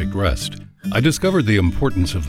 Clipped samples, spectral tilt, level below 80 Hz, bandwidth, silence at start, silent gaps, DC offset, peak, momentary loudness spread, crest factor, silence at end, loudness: under 0.1%; -5.5 dB/octave; -30 dBFS; 15.5 kHz; 0 s; none; under 0.1%; -4 dBFS; 10 LU; 14 dB; 0 s; -19 LUFS